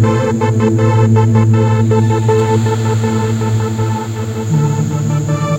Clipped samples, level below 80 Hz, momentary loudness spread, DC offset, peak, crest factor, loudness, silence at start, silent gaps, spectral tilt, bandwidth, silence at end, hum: under 0.1%; -42 dBFS; 6 LU; under 0.1%; 0 dBFS; 12 dB; -13 LUFS; 0 s; none; -7.5 dB/octave; 9 kHz; 0 s; none